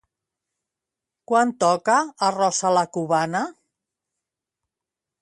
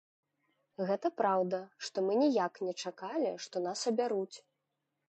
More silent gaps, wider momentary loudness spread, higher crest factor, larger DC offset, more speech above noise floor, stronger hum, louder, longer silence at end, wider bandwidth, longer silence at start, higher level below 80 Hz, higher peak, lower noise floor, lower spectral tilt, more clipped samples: neither; second, 6 LU vs 10 LU; about the same, 18 dB vs 18 dB; neither; first, 67 dB vs 52 dB; neither; first, -21 LUFS vs -34 LUFS; first, 1.7 s vs 0.7 s; first, 11.5 kHz vs 9 kHz; first, 1.3 s vs 0.8 s; first, -74 dBFS vs -88 dBFS; first, -6 dBFS vs -18 dBFS; about the same, -87 dBFS vs -85 dBFS; about the same, -4 dB/octave vs -4.5 dB/octave; neither